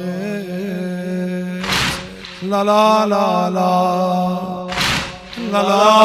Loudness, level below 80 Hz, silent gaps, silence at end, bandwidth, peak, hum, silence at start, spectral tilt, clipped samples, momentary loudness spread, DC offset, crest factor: -17 LUFS; -44 dBFS; none; 0 s; 15.5 kHz; 0 dBFS; none; 0 s; -5 dB/octave; under 0.1%; 11 LU; under 0.1%; 16 dB